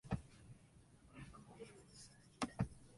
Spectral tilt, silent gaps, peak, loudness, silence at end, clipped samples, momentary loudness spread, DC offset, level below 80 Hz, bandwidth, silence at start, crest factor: -5.5 dB/octave; none; -24 dBFS; -50 LUFS; 0 s; under 0.1%; 19 LU; under 0.1%; -62 dBFS; 11.5 kHz; 0.05 s; 26 dB